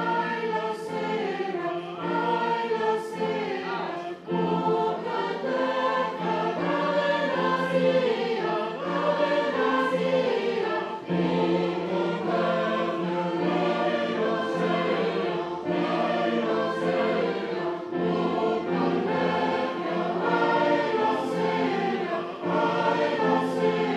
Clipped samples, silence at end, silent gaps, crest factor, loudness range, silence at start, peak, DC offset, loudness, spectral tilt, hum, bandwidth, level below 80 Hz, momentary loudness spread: under 0.1%; 0 s; none; 14 dB; 3 LU; 0 s; -12 dBFS; under 0.1%; -26 LUFS; -6.5 dB/octave; none; 11 kHz; -76 dBFS; 5 LU